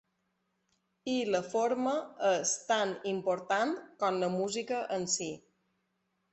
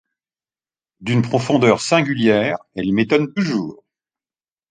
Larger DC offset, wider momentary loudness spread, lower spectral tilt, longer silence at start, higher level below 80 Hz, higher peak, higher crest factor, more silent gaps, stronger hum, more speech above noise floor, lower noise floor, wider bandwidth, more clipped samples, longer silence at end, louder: neither; second, 5 LU vs 9 LU; second, -3 dB/octave vs -6 dB/octave; about the same, 1.05 s vs 1 s; second, -76 dBFS vs -56 dBFS; second, -16 dBFS vs 0 dBFS; about the same, 18 dB vs 18 dB; neither; neither; second, 47 dB vs over 73 dB; second, -79 dBFS vs under -90 dBFS; second, 8.6 kHz vs 9.6 kHz; neither; about the same, 0.95 s vs 0.95 s; second, -32 LUFS vs -18 LUFS